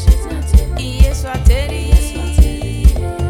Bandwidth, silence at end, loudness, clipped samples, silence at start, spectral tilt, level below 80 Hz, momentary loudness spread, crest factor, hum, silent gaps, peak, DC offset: 14.5 kHz; 0 s; -15 LUFS; under 0.1%; 0 s; -6 dB/octave; -12 dBFS; 3 LU; 12 dB; none; none; 0 dBFS; under 0.1%